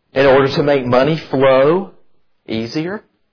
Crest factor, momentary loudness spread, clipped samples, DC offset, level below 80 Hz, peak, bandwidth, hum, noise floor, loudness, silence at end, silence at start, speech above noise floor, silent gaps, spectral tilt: 14 dB; 14 LU; under 0.1%; under 0.1%; -46 dBFS; -2 dBFS; 5.4 kHz; none; -54 dBFS; -14 LUFS; 0.35 s; 0.15 s; 40 dB; none; -7 dB/octave